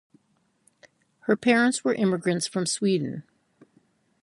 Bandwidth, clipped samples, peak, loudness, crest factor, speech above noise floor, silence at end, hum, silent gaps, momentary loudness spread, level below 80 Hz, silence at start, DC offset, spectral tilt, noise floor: 11.5 kHz; under 0.1%; -6 dBFS; -24 LUFS; 22 dB; 45 dB; 1 s; none; none; 12 LU; -70 dBFS; 1.25 s; under 0.1%; -4.5 dB/octave; -69 dBFS